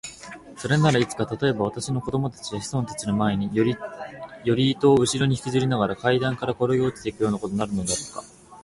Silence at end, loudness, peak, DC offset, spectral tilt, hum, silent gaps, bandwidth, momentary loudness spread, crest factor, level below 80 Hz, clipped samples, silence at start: 0.05 s; -24 LUFS; -6 dBFS; under 0.1%; -5.5 dB/octave; none; none; 11.5 kHz; 15 LU; 18 dB; -52 dBFS; under 0.1%; 0.05 s